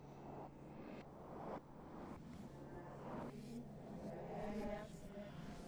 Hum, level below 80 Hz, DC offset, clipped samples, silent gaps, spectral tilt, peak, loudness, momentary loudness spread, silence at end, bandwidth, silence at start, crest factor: none; -64 dBFS; under 0.1%; under 0.1%; none; -7 dB/octave; -36 dBFS; -52 LUFS; 8 LU; 0 s; over 20 kHz; 0 s; 16 dB